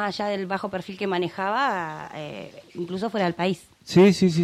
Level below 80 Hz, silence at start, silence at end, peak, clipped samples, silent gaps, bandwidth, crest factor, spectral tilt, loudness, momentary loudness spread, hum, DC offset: -62 dBFS; 0 s; 0 s; -6 dBFS; under 0.1%; none; 13 kHz; 18 dB; -6.5 dB/octave; -24 LUFS; 18 LU; none; under 0.1%